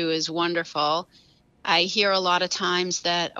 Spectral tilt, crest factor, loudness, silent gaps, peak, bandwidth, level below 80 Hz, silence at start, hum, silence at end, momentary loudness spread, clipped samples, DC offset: -2.5 dB/octave; 18 dB; -23 LUFS; none; -6 dBFS; 8 kHz; -70 dBFS; 0 s; none; 0 s; 5 LU; under 0.1%; under 0.1%